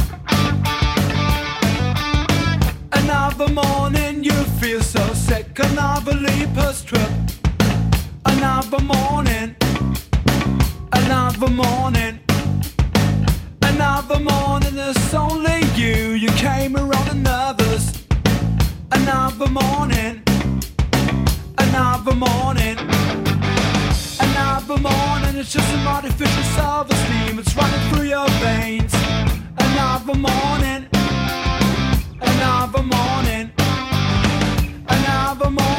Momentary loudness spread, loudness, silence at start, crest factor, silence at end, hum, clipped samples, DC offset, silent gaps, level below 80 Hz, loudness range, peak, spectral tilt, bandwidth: 3 LU; -18 LUFS; 0 s; 16 dB; 0 s; none; under 0.1%; under 0.1%; none; -26 dBFS; 1 LU; 0 dBFS; -5 dB/octave; 16.5 kHz